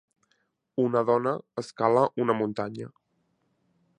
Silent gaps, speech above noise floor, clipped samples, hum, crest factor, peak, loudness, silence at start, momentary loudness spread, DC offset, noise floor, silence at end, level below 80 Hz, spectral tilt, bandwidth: none; 47 dB; under 0.1%; none; 20 dB; -8 dBFS; -26 LUFS; 0.75 s; 14 LU; under 0.1%; -73 dBFS; 1.1 s; -72 dBFS; -7.5 dB/octave; 10.5 kHz